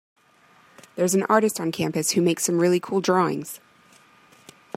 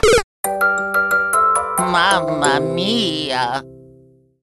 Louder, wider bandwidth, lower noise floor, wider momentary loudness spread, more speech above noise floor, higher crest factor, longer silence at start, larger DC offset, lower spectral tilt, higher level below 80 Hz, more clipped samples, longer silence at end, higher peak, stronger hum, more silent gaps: second, -22 LUFS vs -17 LUFS; first, 16 kHz vs 13.5 kHz; first, -57 dBFS vs -50 dBFS; first, 13 LU vs 5 LU; first, 35 dB vs 31 dB; about the same, 20 dB vs 18 dB; first, 0.95 s vs 0.05 s; neither; first, -4.5 dB/octave vs -3 dB/octave; second, -70 dBFS vs -38 dBFS; neither; first, 1.2 s vs 0.65 s; second, -4 dBFS vs 0 dBFS; neither; second, none vs 0.24-0.43 s